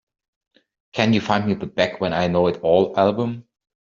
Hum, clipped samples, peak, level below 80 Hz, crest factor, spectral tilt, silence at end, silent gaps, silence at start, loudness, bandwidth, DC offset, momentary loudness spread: none; under 0.1%; -2 dBFS; -56 dBFS; 18 dB; -5 dB/octave; 0.45 s; none; 0.95 s; -20 LUFS; 7.4 kHz; under 0.1%; 8 LU